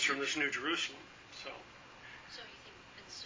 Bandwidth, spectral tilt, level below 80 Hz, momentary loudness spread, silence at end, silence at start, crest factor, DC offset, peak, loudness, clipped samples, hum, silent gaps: 7.8 kHz; -1.5 dB/octave; -72 dBFS; 20 LU; 0 s; 0 s; 20 dB; under 0.1%; -20 dBFS; -37 LUFS; under 0.1%; none; none